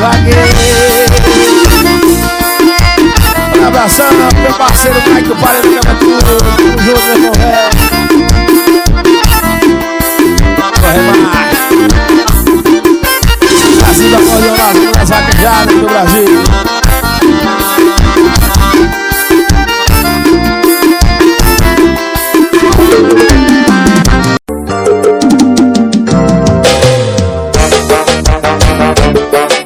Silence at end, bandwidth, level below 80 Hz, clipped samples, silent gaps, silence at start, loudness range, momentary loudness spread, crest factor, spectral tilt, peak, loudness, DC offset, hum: 0 s; over 20 kHz; -14 dBFS; 7%; none; 0 s; 2 LU; 4 LU; 6 dB; -4.5 dB/octave; 0 dBFS; -7 LUFS; under 0.1%; none